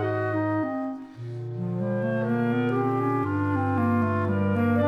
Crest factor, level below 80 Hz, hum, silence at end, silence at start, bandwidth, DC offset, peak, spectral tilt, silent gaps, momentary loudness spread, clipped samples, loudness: 14 dB; -66 dBFS; none; 0 s; 0 s; 5.6 kHz; under 0.1%; -12 dBFS; -9.5 dB/octave; none; 10 LU; under 0.1%; -26 LUFS